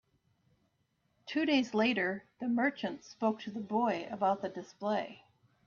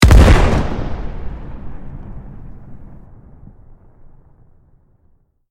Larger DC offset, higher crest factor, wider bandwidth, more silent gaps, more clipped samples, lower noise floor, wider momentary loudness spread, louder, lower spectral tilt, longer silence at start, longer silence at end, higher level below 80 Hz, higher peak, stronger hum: neither; about the same, 16 dB vs 16 dB; second, 7.2 kHz vs 14.5 kHz; neither; second, under 0.1% vs 0.3%; first, -77 dBFS vs -55 dBFS; second, 11 LU vs 29 LU; second, -33 LUFS vs -14 LUFS; about the same, -5.5 dB/octave vs -6 dB/octave; first, 1.25 s vs 0 s; second, 0.5 s vs 2.55 s; second, -78 dBFS vs -18 dBFS; second, -18 dBFS vs 0 dBFS; neither